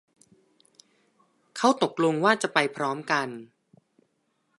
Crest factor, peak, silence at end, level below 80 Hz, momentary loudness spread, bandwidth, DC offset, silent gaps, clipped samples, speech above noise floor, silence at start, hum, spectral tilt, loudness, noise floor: 24 dB; -4 dBFS; 1.15 s; -80 dBFS; 13 LU; 11.5 kHz; under 0.1%; none; under 0.1%; 49 dB; 1.55 s; none; -4 dB/octave; -25 LUFS; -73 dBFS